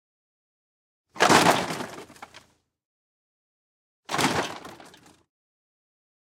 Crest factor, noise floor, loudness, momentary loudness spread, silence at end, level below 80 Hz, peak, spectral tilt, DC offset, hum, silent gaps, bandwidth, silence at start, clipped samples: 28 dB; -56 dBFS; -23 LUFS; 25 LU; 1.6 s; -66 dBFS; 0 dBFS; -3 dB/octave; under 0.1%; none; 2.85-4.03 s; 17.5 kHz; 1.15 s; under 0.1%